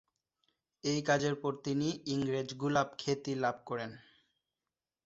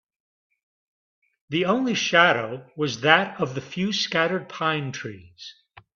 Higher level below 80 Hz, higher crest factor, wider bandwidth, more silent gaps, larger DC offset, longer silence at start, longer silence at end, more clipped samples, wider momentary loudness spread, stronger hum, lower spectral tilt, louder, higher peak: second, -72 dBFS vs -66 dBFS; about the same, 20 dB vs 24 dB; about the same, 8 kHz vs 7.4 kHz; neither; neither; second, 0.85 s vs 1.5 s; first, 1.05 s vs 0.45 s; neither; second, 9 LU vs 19 LU; neither; about the same, -4.5 dB/octave vs -4 dB/octave; second, -34 LUFS vs -22 LUFS; second, -16 dBFS vs -2 dBFS